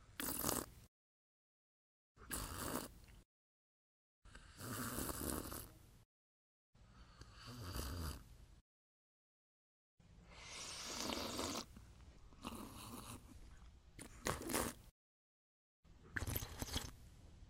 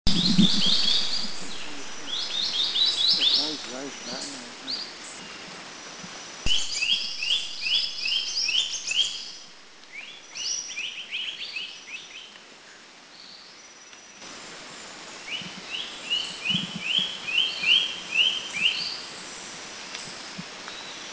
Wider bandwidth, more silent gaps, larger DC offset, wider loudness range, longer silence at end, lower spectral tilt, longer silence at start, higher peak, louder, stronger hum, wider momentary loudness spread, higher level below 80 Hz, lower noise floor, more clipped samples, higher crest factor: first, 16 kHz vs 8 kHz; first, 0.88-2.15 s, 3.25-4.22 s, 6.05-6.73 s, 8.61-9.98 s, 14.91-15.83 s vs none; neither; second, 7 LU vs 14 LU; about the same, 0 s vs 0 s; about the same, -3 dB/octave vs -2 dB/octave; about the same, 0 s vs 0.05 s; second, -18 dBFS vs -6 dBFS; second, -46 LUFS vs -24 LUFS; neither; about the same, 22 LU vs 21 LU; second, -60 dBFS vs -50 dBFS; first, under -90 dBFS vs -49 dBFS; neither; first, 32 dB vs 22 dB